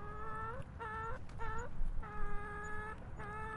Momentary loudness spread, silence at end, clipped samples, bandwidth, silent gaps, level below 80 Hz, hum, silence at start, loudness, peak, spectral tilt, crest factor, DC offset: 3 LU; 0 s; under 0.1%; 7.4 kHz; none; -44 dBFS; none; 0 s; -45 LUFS; -24 dBFS; -6.5 dB/octave; 14 dB; under 0.1%